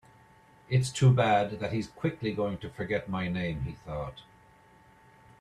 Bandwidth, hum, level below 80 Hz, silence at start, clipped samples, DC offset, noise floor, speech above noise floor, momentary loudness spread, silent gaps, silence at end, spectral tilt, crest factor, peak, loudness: 11 kHz; none; -54 dBFS; 0.7 s; under 0.1%; under 0.1%; -58 dBFS; 30 dB; 14 LU; none; 1.2 s; -6.5 dB/octave; 18 dB; -12 dBFS; -30 LUFS